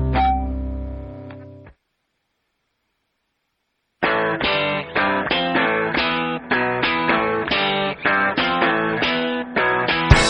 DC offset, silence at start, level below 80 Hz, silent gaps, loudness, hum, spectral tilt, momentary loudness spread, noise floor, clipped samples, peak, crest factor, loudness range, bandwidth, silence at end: under 0.1%; 0 s; -32 dBFS; none; -19 LUFS; none; -5 dB/octave; 11 LU; -73 dBFS; under 0.1%; 0 dBFS; 22 dB; 11 LU; 10.5 kHz; 0 s